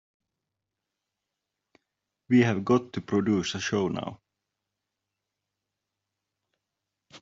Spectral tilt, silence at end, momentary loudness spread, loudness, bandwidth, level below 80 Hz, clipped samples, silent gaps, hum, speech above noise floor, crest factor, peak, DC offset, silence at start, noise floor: -5.5 dB/octave; 0.05 s; 8 LU; -26 LUFS; 7.8 kHz; -68 dBFS; under 0.1%; none; none; 61 dB; 22 dB; -10 dBFS; under 0.1%; 2.3 s; -86 dBFS